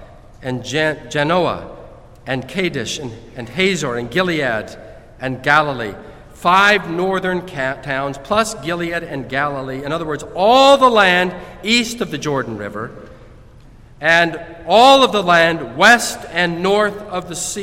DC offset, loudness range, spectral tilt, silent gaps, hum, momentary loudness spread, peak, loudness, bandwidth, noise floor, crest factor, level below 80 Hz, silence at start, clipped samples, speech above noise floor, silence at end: under 0.1%; 7 LU; -3.5 dB/octave; none; none; 16 LU; 0 dBFS; -16 LUFS; 16.5 kHz; -42 dBFS; 18 dB; -44 dBFS; 0 s; under 0.1%; 25 dB; 0 s